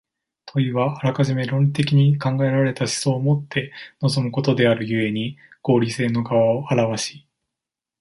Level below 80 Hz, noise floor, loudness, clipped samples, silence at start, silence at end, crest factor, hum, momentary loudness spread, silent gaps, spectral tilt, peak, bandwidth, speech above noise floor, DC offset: -60 dBFS; -86 dBFS; -21 LUFS; under 0.1%; 0.45 s; 0.85 s; 16 dB; none; 9 LU; none; -6 dB/octave; -4 dBFS; 11.5 kHz; 66 dB; under 0.1%